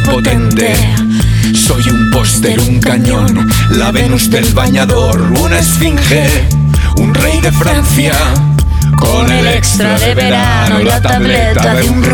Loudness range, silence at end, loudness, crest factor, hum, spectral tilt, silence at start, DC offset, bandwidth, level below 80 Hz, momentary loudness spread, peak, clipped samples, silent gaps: 0 LU; 0 s; -9 LUFS; 8 dB; none; -5 dB/octave; 0 s; under 0.1%; 20 kHz; -18 dBFS; 1 LU; 0 dBFS; under 0.1%; none